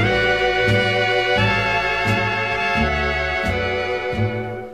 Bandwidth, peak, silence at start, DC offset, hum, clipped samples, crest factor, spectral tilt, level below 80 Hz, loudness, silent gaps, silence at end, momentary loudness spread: 14 kHz; -6 dBFS; 0 s; 0.5%; none; under 0.1%; 14 dB; -5.5 dB/octave; -36 dBFS; -19 LUFS; none; 0 s; 5 LU